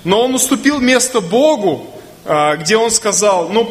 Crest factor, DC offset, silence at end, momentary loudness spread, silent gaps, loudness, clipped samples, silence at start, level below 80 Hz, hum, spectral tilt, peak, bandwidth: 14 dB; under 0.1%; 0 s; 6 LU; none; -13 LUFS; under 0.1%; 0.05 s; -50 dBFS; none; -3 dB/octave; 0 dBFS; 15.5 kHz